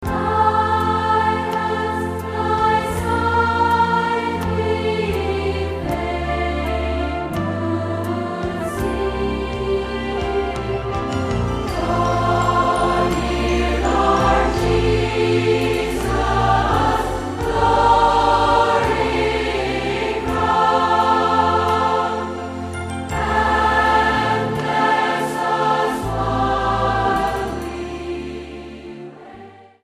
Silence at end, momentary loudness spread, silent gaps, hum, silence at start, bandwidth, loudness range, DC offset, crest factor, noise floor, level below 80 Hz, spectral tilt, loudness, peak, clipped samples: 0.2 s; 8 LU; none; none; 0 s; 15.5 kHz; 6 LU; under 0.1%; 16 dB; -41 dBFS; -32 dBFS; -6 dB/octave; -19 LUFS; -2 dBFS; under 0.1%